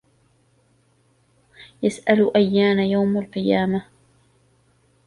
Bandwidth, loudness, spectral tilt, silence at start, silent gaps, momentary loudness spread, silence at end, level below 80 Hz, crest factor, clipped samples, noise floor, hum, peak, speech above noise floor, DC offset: 11 kHz; -20 LUFS; -7 dB/octave; 1.6 s; none; 8 LU; 1.25 s; -60 dBFS; 20 dB; under 0.1%; -62 dBFS; none; -4 dBFS; 43 dB; under 0.1%